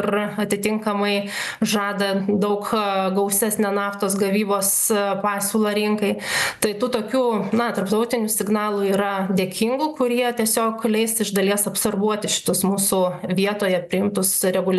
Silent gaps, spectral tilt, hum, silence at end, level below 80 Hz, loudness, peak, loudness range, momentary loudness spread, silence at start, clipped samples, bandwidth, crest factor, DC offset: none; -3.5 dB/octave; none; 0 s; -62 dBFS; -21 LUFS; -2 dBFS; 1 LU; 3 LU; 0 s; under 0.1%; 13 kHz; 18 dB; under 0.1%